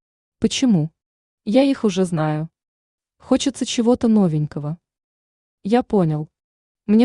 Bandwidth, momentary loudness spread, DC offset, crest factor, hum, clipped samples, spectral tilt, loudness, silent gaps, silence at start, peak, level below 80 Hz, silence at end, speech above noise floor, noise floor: 11 kHz; 16 LU; under 0.1%; 16 dB; none; under 0.1%; -6 dB/octave; -20 LUFS; 1.06-1.38 s, 2.68-2.98 s, 5.04-5.58 s, 6.44-6.75 s; 0.4 s; -4 dBFS; -54 dBFS; 0 s; over 72 dB; under -90 dBFS